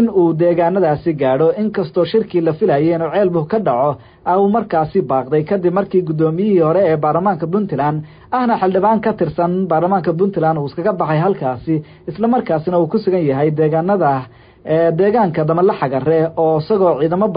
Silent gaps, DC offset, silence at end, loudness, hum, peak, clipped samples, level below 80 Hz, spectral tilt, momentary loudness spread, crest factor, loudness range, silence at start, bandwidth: none; under 0.1%; 0 s; -16 LUFS; none; -4 dBFS; under 0.1%; -50 dBFS; -13 dB/octave; 5 LU; 12 dB; 2 LU; 0 s; 5.2 kHz